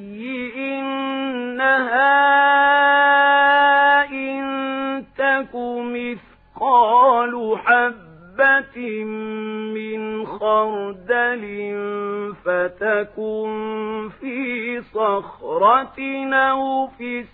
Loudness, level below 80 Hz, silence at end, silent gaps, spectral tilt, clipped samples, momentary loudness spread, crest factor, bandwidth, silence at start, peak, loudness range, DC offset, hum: -19 LUFS; -60 dBFS; 0.05 s; none; -7 dB/octave; under 0.1%; 14 LU; 16 dB; 4.5 kHz; 0 s; -2 dBFS; 9 LU; under 0.1%; none